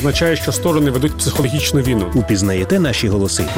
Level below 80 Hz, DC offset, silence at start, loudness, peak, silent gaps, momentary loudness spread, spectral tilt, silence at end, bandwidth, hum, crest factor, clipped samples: -30 dBFS; under 0.1%; 0 s; -16 LUFS; -4 dBFS; none; 2 LU; -5 dB/octave; 0 s; 17 kHz; none; 10 dB; under 0.1%